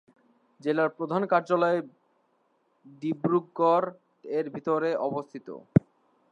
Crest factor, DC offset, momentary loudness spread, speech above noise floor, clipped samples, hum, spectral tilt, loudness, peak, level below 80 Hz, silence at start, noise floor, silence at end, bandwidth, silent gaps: 24 dB; under 0.1%; 12 LU; 43 dB; under 0.1%; none; -8.5 dB/octave; -27 LUFS; -4 dBFS; -60 dBFS; 0.65 s; -70 dBFS; 0.5 s; 7.4 kHz; none